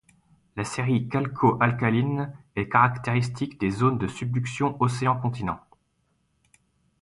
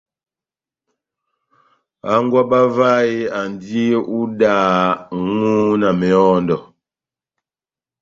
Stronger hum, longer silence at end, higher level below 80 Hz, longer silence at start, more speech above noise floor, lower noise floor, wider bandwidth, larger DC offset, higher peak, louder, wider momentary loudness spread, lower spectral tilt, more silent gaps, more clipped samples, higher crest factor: neither; about the same, 1.45 s vs 1.35 s; about the same, -54 dBFS vs -56 dBFS; second, 0.55 s vs 2.05 s; second, 46 dB vs over 75 dB; second, -71 dBFS vs under -90 dBFS; first, 11.5 kHz vs 7.6 kHz; neither; about the same, -4 dBFS vs -2 dBFS; second, -25 LUFS vs -16 LUFS; about the same, 11 LU vs 9 LU; about the same, -7 dB/octave vs -7 dB/octave; neither; neither; first, 22 dB vs 16 dB